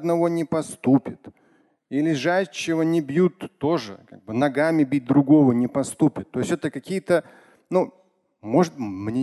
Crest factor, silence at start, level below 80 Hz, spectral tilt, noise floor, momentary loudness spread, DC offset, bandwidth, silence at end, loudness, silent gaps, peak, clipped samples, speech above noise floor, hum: 18 dB; 0 s; -62 dBFS; -6.5 dB/octave; -61 dBFS; 10 LU; under 0.1%; 12.5 kHz; 0 s; -22 LUFS; none; -4 dBFS; under 0.1%; 40 dB; none